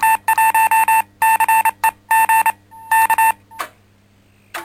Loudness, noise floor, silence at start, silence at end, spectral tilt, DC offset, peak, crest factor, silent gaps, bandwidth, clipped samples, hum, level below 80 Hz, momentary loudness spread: -14 LUFS; -53 dBFS; 0 s; 0 s; 0.5 dB/octave; under 0.1%; -4 dBFS; 12 dB; none; 16.5 kHz; under 0.1%; none; -58 dBFS; 15 LU